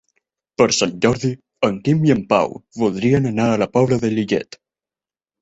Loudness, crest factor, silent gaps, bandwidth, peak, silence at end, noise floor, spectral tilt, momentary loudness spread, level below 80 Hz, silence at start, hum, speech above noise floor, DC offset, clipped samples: -18 LUFS; 18 dB; none; 8.2 kHz; -2 dBFS; 1 s; under -90 dBFS; -5.5 dB/octave; 7 LU; -50 dBFS; 0.6 s; none; over 73 dB; under 0.1%; under 0.1%